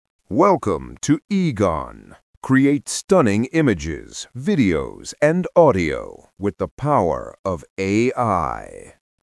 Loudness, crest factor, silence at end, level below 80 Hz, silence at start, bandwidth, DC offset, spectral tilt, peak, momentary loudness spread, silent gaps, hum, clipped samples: -20 LUFS; 18 dB; 0.35 s; -46 dBFS; 0.3 s; 12 kHz; under 0.1%; -6 dB/octave; -2 dBFS; 13 LU; 1.24-1.28 s, 2.23-2.41 s, 3.04-3.08 s, 6.71-6.77 s, 7.39-7.44 s, 7.70-7.77 s; none; under 0.1%